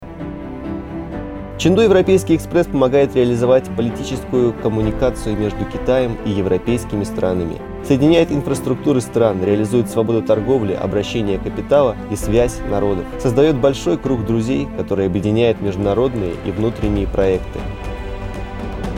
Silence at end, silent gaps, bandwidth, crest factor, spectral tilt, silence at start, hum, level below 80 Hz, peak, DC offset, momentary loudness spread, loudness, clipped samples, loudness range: 0 s; none; 16.5 kHz; 16 dB; -7 dB/octave; 0 s; none; -32 dBFS; 0 dBFS; under 0.1%; 13 LU; -18 LUFS; under 0.1%; 3 LU